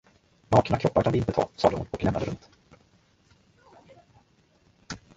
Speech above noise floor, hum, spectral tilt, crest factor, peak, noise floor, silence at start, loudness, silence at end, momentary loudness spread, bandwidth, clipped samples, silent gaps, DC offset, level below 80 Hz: 38 dB; none; -7 dB/octave; 24 dB; -6 dBFS; -63 dBFS; 0.5 s; -25 LUFS; 0.2 s; 17 LU; 7.8 kHz; under 0.1%; none; under 0.1%; -48 dBFS